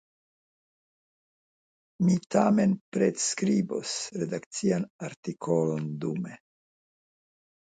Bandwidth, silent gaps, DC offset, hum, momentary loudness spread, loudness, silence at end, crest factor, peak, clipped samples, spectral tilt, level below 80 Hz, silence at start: 9.4 kHz; 2.81-2.92 s, 4.46-4.51 s, 4.90-4.99 s, 5.16-5.23 s; under 0.1%; none; 12 LU; -28 LUFS; 1.4 s; 20 dB; -10 dBFS; under 0.1%; -5.5 dB/octave; -70 dBFS; 2 s